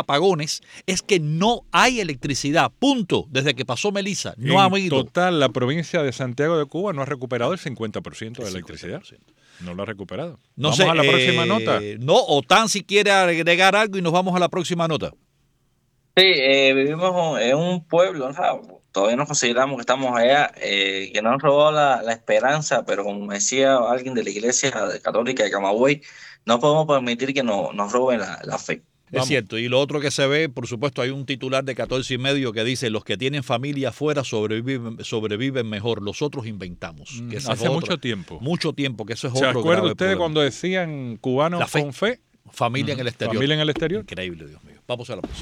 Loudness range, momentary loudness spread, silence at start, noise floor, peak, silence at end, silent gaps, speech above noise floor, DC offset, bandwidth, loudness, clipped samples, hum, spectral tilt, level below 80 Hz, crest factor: 8 LU; 14 LU; 0 s; -65 dBFS; -4 dBFS; 0 s; none; 44 dB; under 0.1%; 15.5 kHz; -21 LUFS; under 0.1%; none; -4 dB/octave; -56 dBFS; 18 dB